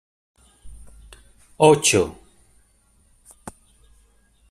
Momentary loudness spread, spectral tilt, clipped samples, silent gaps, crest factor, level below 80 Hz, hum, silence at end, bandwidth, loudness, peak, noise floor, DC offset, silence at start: 28 LU; -3.5 dB/octave; under 0.1%; none; 22 dB; -52 dBFS; none; 1 s; 14 kHz; -17 LUFS; -2 dBFS; -59 dBFS; under 0.1%; 0.65 s